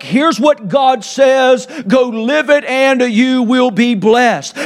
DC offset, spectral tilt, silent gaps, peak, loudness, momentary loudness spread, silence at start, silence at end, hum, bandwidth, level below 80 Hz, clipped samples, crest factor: under 0.1%; -4.5 dB/octave; none; 0 dBFS; -11 LUFS; 3 LU; 0 s; 0 s; none; 12.5 kHz; -60 dBFS; under 0.1%; 12 dB